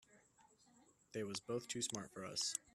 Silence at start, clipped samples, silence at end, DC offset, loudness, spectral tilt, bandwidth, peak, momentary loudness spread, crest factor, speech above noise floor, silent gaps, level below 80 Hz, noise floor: 0.1 s; under 0.1%; 0.05 s; under 0.1%; -44 LUFS; -2.5 dB/octave; 14.5 kHz; -24 dBFS; 7 LU; 24 dB; 26 dB; none; -82 dBFS; -71 dBFS